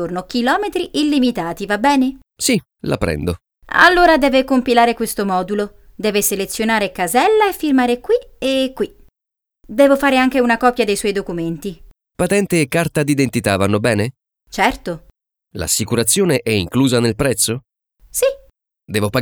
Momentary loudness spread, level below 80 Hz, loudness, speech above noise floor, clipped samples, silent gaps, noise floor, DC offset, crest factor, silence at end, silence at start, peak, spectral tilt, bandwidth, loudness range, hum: 12 LU; -42 dBFS; -16 LUFS; 68 dB; under 0.1%; none; -84 dBFS; under 0.1%; 16 dB; 0 s; 0 s; 0 dBFS; -4 dB/octave; over 20 kHz; 3 LU; none